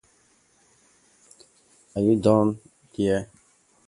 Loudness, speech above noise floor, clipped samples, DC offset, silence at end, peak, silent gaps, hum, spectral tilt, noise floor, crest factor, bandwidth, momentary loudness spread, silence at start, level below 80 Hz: -23 LUFS; 41 dB; under 0.1%; under 0.1%; 0.65 s; -4 dBFS; none; none; -7.5 dB/octave; -62 dBFS; 22 dB; 11.5 kHz; 21 LU; 1.95 s; -56 dBFS